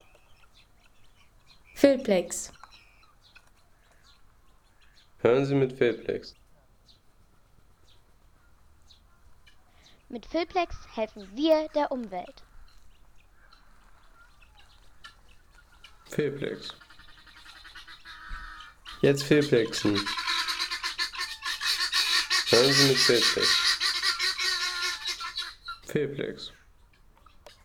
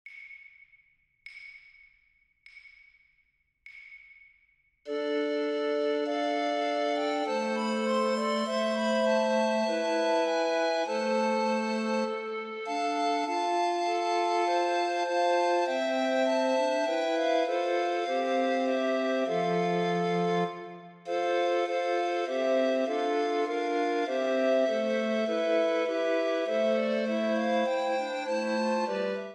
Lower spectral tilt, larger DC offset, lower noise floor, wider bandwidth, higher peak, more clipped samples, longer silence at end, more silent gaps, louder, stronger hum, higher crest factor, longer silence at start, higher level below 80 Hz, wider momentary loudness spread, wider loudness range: about the same, -3.5 dB/octave vs -4.5 dB/octave; neither; second, -59 dBFS vs -72 dBFS; first, 19.5 kHz vs 10.5 kHz; first, -6 dBFS vs -16 dBFS; neither; first, 1.15 s vs 0 s; neither; about the same, -26 LUFS vs -28 LUFS; neither; first, 24 dB vs 14 dB; first, 1.75 s vs 0.05 s; first, -56 dBFS vs -84 dBFS; first, 22 LU vs 6 LU; first, 16 LU vs 3 LU